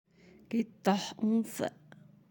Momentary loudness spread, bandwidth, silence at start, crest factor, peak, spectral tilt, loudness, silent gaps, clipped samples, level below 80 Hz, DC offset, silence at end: 7 LU; 17 kHz; 0.5 s; 20 dB; -14 dBFS; -5.5 dB/octave; -33 LUFS; none; under 0.1%; -78 dBFS; under 0.1%; 0.6 s